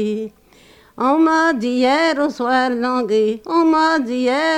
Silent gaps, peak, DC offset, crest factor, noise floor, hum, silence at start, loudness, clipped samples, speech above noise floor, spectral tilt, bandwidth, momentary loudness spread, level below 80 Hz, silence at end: none; -6 dBFS; under 0.1%; 12 dB; -48 dBFS; none; 0 s; -17 LUFS; under 0.1%; 32 dB; -4.5 dB/octave; 10 kHz; 6 LU; -58 dBFS; 0 s